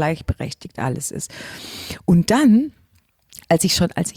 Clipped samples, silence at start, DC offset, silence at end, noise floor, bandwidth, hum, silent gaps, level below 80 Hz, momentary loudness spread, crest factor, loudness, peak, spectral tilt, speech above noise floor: under 0.1%; 0 s; under 0.1%; 0.05 s; -60 dBFS; 19 kHz; none; none; -42 dBFS; 17 LU; 16 dB; -19 LUFS; -4 dBFS; -5 dB/octave; 40 dB